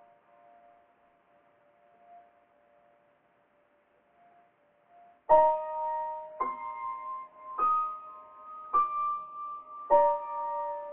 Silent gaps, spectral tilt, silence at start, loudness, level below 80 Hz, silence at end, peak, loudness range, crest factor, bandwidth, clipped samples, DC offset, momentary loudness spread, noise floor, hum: none; -3.5 dB/octave; 2.1 s; -30 LUFS; -66 dBFS; 0 s; -10 dBFS; 3 LU; 22 dB; 3.8 kHz; under 0.1%; under 0.1%; 19 LU; -68 dBFS; none